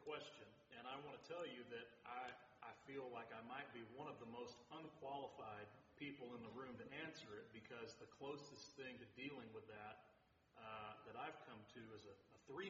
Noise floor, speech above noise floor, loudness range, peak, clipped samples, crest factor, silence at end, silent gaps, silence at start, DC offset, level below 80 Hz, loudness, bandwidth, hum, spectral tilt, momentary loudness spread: -76 dBFS; 20 dB; 2 LU; -36 dBFS; under 0.1%; 20 dB; 0 s; none; 0 s; under 0.1%; -88 dBFS; -56 LUFS; 7.4 kHz; none; -3 dB/octave; 7 LU